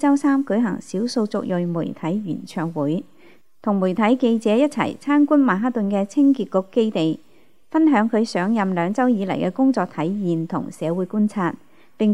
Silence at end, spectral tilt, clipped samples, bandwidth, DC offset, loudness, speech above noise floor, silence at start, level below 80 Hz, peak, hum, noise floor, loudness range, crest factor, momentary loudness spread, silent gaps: 0 s; -7 dB/octave; under 0.1%; 11 kHz; 0.4%; -21 LUFS; 31 dB; 0 s; -70 dBFS; -4 dBFS; none; -51 dBFS; 4 LU; 16 dB; 8 LU; none